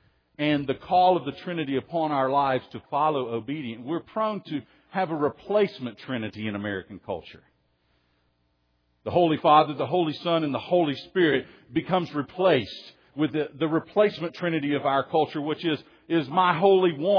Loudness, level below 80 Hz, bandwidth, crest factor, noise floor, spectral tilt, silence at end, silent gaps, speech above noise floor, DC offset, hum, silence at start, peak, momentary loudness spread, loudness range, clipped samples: -25 LUFS; -66 dBFS; 5.4 kHz; 20 dB; -70 dBFS; -8 dB/octave; 0 s; none; 45 dB; under 0.1%; none; 0.4 s; -6 dBFS; 12 LU; 6 LU; under 0.1%